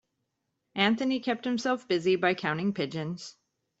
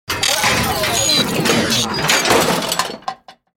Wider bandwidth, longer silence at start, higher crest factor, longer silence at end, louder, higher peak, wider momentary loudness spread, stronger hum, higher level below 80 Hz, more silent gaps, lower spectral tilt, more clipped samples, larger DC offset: second, 8 kHz vs 17 kHz; first, 0.75 s vs 0.1 s; first, 22 dB vs 16 dB; first, 0.5 s vs 0.25 s; second, -28 LUFS vs -15 LUFS; second, -8 dBFS vs -2 dBFS; first, 12 LU vs 7 LU; neither; second, -72 dBFS vs -42 dBFS; neither; first, -5.5 dB/octave vs -2 dB/octave; neither; neither